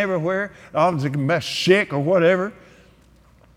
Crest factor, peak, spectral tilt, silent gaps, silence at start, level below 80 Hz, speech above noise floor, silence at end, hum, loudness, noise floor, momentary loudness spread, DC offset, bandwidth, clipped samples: 18 dB; -2 dBFS; -5.5 dB/octave; none; 0 s; -58 dBFS; 33 dB; 1.05 s; none; -20 LUFS; -53 dBFS; 8 LU; under 0.1%; 15.5 kHz; under 0.1%